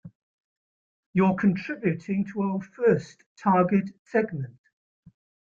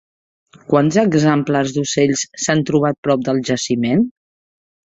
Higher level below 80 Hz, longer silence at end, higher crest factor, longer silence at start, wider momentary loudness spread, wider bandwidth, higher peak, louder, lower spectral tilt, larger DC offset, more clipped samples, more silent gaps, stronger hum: second, -66 dBFS vs -54 dBFS; first, 1 s vs 0.75 s; about the same, 18 dB vs 16 dB; second, 0.05 s vs 0.7 s; first, 9 LU vs 5 LU; second, 7.4 kHz vs 8.2 kHz; second, -8 dBFS vs -2 dBFS; second, -26 LUFS vs -17 LUFS; first, -9 dB/octave vs -5 dB/octave; neither; neither; first, 0.15-1.13 s, 3.26-3.36 s, 3.99-4.06 s vs 2.98-3.03 s; neither